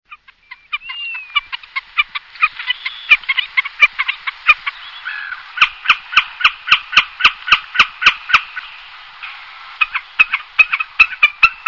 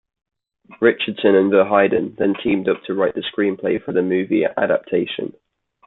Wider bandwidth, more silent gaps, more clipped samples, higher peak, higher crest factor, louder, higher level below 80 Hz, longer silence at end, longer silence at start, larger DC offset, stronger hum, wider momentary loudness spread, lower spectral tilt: first, 6 kHz vs 4.1 kHz; neither; first, 0.3% vs under 0.1%; about the same, 0 dBFS vs -2 dBFS; about the same, 18 dB vs 18 dB; first, -14 LUFS vs -19 LUFS; first, -50 dBFS vs -58 dBFS; second, 0.1 s vs 0.6 s; second, 0.1 s vs 0.7 s; first, 0.1% vs under 0.1%; neither; first, 16 LU vs 7 LU; second, 0.5 dB/octave vs -10.5 dB/octave